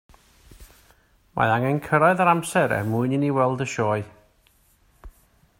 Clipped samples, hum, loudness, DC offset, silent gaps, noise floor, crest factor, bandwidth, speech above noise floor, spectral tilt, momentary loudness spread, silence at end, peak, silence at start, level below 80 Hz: under 0.1%; none; -22 LUFS; under 0.1%; none; -61 dBFS; 20 dB; 16 kHz; 39 dB; -6.5 dB/octave; 7 LU; 0.5 s; -4 dBFS; 0.6 s; -54 dBFS